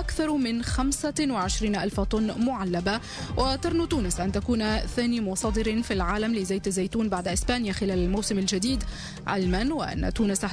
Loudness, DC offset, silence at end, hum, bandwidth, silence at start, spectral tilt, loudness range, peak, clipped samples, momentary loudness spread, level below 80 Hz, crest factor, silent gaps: -27 LUFS; under 0.1%; 0 s; none; 11 kHz; 0 s; -4.5 dB/octave; 0 LU; -14 dBFS; under 0.1%; 2 LU; -36 dBFS; 14 dB; none